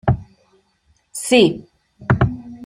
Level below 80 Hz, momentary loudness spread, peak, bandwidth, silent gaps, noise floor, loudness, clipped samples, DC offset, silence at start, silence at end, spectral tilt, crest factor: -38 dBFS; 19 LU; -2 dBFS; 15.5 kHz; none; -62 dBFS; -18 LUFS; under 0.1%; under 0.1%; 0.05 s; 0 s; -5.5 dB/octave; 18 dB